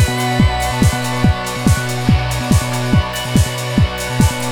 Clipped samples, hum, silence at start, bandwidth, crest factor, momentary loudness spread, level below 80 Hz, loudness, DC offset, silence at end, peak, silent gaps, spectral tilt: under 0.1%; none; 0 s; 18.5 kHz; 14 dB; 2 LU; -24 dBFS; -16 LUFS; under 0.1%; 0 s; 0 dBFS; none; -5 dB/octave